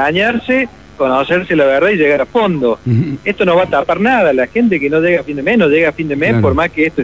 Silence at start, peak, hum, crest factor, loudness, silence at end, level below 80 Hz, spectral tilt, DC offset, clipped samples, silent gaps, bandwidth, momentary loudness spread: 0 s; -2 dBFS; none; 12 dB; -13 LUFS; 0 s; -38 dBFS; -7.5 dB/octave; 0.4%; under 0.1%; none; 8 kHz; 4 LU